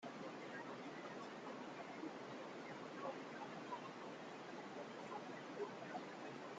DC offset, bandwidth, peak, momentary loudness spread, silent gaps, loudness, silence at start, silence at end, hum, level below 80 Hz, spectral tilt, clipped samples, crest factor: under 0.1%; 9 kHz; -36 dBFS; 3 LU; none; -51 LUFS; 0 s; 0 s; none; under -90 dBFS; -5 dB/octave; under 0.1%; 16 dB